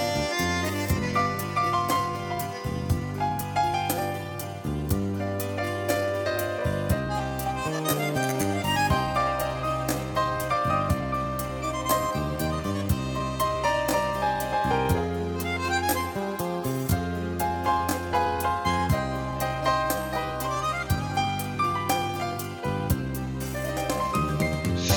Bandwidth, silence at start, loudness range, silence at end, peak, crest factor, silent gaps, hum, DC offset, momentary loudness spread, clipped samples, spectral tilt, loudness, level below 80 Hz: 19 kHz; 0 s; 2 LU; 0 s; -10 dBFS; 18 dB; none; none; under 0.1%; 5 LU; under 0.1%; -5 dB/octave; -27 LUFS; -42 dBFS